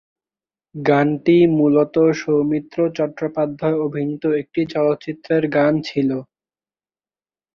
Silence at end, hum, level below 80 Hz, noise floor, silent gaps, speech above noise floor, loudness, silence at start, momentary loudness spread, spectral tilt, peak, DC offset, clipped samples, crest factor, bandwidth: 1.3 s; none; -60 dBFS; under -90 dBFS; none; over 72 dB; -19 LUFS; 0.75 s; 8 LU; -8 dB/octave; -2 dBFS; under 0.1%; under 0.1%; 16 dB; 6.8 kHz